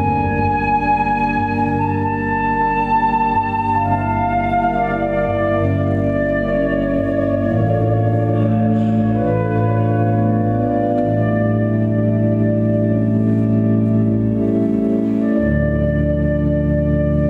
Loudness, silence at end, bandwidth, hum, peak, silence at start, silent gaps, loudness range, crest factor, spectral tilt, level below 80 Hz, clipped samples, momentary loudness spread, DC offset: -17 LUFS; 0 s; 4.7 kHz; none; -4 dBFS; 0 s; none; 1 LU; 12 dB; -10.5 dB/octave; -32 dBFS; under 0.1%; 2 LU; under 0.1%